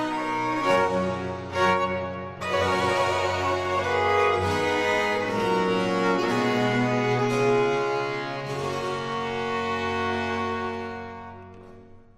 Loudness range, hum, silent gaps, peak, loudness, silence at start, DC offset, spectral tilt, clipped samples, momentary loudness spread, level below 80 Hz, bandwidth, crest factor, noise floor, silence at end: 5 LU; none; none; -10 dBFS; -25 LUFS; 0 s; under 0.1%; -5 dB/octave; under 0.1%; 8 LU; -56 dBFS; 13.5 kHz; 14 dB; -47 dBFS; 0.15 s